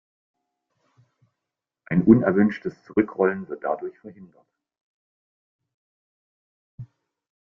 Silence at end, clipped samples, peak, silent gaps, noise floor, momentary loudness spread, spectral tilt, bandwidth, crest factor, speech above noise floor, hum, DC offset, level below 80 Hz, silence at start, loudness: 0.65 s; under 0.1%; -2 dBFS; 4.81-5.59 s, 5.74-6.78 s; -86 dBFS; 14 LU; -10.5 dB/octave; 5.8 kHz; 24 dB; 64 dB; none; under 0.1%; -62 dBFS; 1.9 s; -22 LUFS